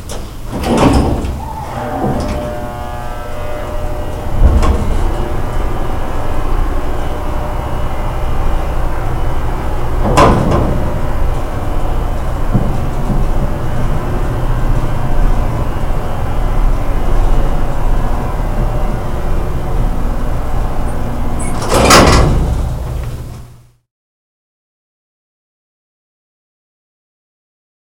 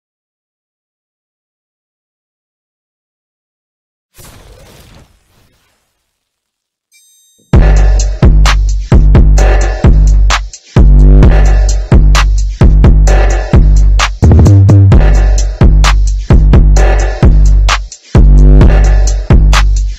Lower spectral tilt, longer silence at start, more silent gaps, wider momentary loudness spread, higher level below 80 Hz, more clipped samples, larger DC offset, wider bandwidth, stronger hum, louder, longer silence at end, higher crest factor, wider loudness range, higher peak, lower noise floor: about the same, -5.5 dB/octave vs -6 dB/octave; second, 0 s vs 7.55 s; neither; first, 11 LU vs 7 LU; second, -16 dBFS vs -8 dBFS; first, 0.2% vs under 0.1%; neither; first, 16 kHz vs 8.2 kHz; neither; second, -17 LUFS vs -8 LUFS; first, 4.45 s vs 0 s; first, 14 dB vs 6 dB; about the same, 7 LU vs 5 LU; about the same, 0 dBFS vs 0 dBFS; second, -37 dBFS vs -74 dBFS